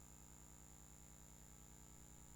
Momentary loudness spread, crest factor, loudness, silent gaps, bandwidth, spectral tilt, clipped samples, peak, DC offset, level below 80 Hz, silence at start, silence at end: 0 LU; 14 dB; -61 LUFS; none; 19 kHz; -3.5 dB/octave; under 0.1%; -46 dBFS; under 0.1%; -68 dBFS; 0 s; 0 s